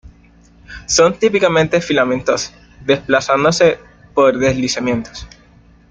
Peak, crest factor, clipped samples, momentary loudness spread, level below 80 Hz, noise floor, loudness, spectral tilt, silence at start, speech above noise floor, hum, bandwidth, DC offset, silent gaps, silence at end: -2 dBFS; 16 dB; under 0.1%; 15 LU; -44 dBFS; -47 dBFS; -15 LUFS; -4 dB/octave; 0.05 s; 32 dB; none; 9.4 kHz; under 0.1%; none; 0.65 s